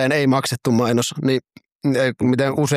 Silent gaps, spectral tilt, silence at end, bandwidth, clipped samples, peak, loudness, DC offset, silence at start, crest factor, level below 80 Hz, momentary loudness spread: 1.72-1.79 s; -5.5 dB/octave; 0 s; 15.5 kHz; under 0.1%; -4 dBFS; -19 LUFS; under 0.1%; 0 s; 14 dB; -58 dBFS; 4 LU